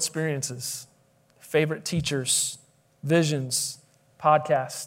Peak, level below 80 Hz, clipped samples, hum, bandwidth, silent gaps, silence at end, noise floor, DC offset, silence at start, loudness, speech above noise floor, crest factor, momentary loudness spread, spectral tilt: -6 dBFS; -62 dBFS; under 0.1%; none; 16 kHz; none; 0 s; -62 dBFS; under 0.1%; 0 s; -25 LUFS; 37 dB; 20 dB; 12 LU; -3.5 dB/octave